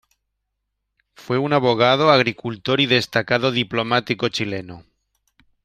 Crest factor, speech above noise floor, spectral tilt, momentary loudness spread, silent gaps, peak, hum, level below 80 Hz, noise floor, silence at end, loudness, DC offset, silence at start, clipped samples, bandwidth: 18 dB; 58 dB; -5.5 dB/octave; 11 LU; none; -2 dBFS; none; -60 dBFS; -77 dBFS; 0.85 s; -19 LUFS; under 0.1%; 1.2 s; under 0.1%; 14 kHz